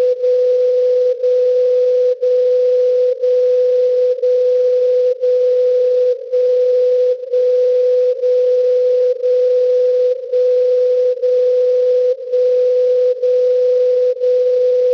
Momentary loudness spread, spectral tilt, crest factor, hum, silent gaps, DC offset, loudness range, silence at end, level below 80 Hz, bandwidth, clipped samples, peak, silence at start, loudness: 2 LU; -3.5 dB/octave; 4 dB; none; none; under 0.1%; 0 LU; 0 s; -66 dBFS; 6 kHz; under 0.1%; -8 dBFS; 0 s; -14 LUFS